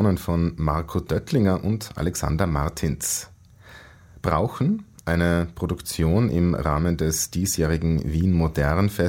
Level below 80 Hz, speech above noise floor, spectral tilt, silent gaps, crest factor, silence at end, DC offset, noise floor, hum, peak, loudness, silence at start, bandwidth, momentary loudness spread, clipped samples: -36 dBFS; 25 dB; -6 dB/octave; none; 18 dB; 0 s; under 0.1%; -47 dBFS; none; -4 dBFS; -23 LUFS; 0 s; 16.5 kHz; 6 LU; under 0.1%